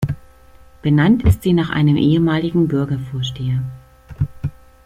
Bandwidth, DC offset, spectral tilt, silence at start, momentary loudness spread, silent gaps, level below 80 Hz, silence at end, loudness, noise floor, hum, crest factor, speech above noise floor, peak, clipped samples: 15 kHz; under 0.1%; -8 dB/octave; 0 s; 12 LU; none; -36 dBFS; 0.35 s; -17 LUFS; -44 dBFS; none; 16 dB; 29 dB; -2 dBFS; under 0.1%